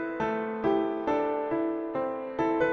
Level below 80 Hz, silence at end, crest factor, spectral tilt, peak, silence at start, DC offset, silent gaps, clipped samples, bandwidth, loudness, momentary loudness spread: -60 dBFS; 0 s; 14 dB; -7.5 dB/octave; -14 dBFS; 0 s; under 0.1%; none; under 0.1%; 6.4 kHz; -29 LUFS; 4 LU